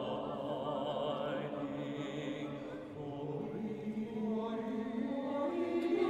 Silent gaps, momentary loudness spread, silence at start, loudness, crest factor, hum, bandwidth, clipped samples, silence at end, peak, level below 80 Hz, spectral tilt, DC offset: none; 6 LU; 0 s; -39 LUFS; 16 dB; none; 9.8 kHz; under 0.1%; 0 s; -20 dBFS; -70 dBFS; -7.5 dB/octave; under 0.1%